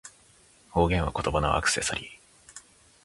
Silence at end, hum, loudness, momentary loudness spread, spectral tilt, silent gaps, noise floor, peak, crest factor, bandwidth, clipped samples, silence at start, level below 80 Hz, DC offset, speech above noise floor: 0.45 s; none; -27 LUFS; 23 LU; -4 dB/octave; none; -58 dBFS; -8 dBFS; 20 dB; 11.5 kHz; under 0.1%; 0.05 s; -40 dBFS; under 0.1%; 32 dB